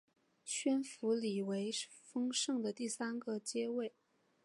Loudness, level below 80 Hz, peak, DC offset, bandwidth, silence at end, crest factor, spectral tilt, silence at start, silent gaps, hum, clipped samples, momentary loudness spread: -39 LUFS; under -90 dBFS; -24 dBFS; under 0.1%; 11.5 kHz; 0.55 s; 16 dB; -3.5 dB/octave; 0.45 s; none; none; under 0.1%; 6 LU